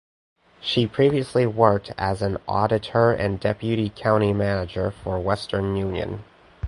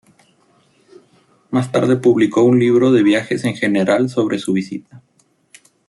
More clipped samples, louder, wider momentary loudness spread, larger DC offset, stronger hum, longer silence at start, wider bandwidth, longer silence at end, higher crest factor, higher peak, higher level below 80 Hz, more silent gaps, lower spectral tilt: neither; second, -23 LUFS vs -15 LUFS; about the same, 8 LU vs 9 LU; neither; neither; second, 0.6 s vs 1.5 s; about the same, 11.5 kHz vs 12 kHz; second, 0 s vs 0.9 s; first, 22 dB vs 14 dB; about the same, 0 dBFS vs -2 dBFS; first, -44 dBFS vs -60 dBFS; neither; about the same, -7 dB/octave vs -6.5 dB/octave